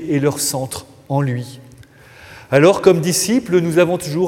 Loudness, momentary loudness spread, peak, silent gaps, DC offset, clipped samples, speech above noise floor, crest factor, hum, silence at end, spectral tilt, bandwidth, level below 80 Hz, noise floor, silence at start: -16 LUFS; 14 LU; 0 dBFS; none; under 0.1%; under 0.1%; 27 dB; 16 dB; none; 0 s; -5 dB/octave; 16.5 kHz; -54 dBFS; -43 dBFS; 0 s